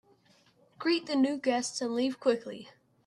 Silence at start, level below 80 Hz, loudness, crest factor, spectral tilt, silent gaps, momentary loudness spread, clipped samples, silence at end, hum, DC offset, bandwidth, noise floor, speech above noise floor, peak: 0.8 s; -80 dBFS; -30 LUFS; 18 dB; -3 dB/octave; none; 7 LU; under 0.1%; 0.35 s; none; under 0.1%; 11.5 kHz; -65 dBFS; 35 dB; -14 dBFS